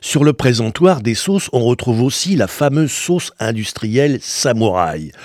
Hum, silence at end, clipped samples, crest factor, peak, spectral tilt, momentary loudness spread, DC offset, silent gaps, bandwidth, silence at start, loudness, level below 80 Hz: none; 0 s; under 0.1%; 16 dB; 0 dBFS; -5 dB/octave; 6 LU; under 0.1%; none; 16.5 kHz; 0 s; -16 LUFS; -48 dBFS